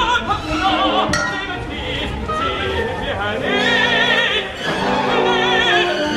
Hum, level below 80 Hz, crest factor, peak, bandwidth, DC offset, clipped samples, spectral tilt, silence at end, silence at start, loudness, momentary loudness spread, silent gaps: none; -36 dBFS; 14 dB; -4 dBFS; 14 kHz; under 0.1%; under 0.1%; -4 dB/octave; 0 s; 0 s; -17 LUFS; 9 LU; none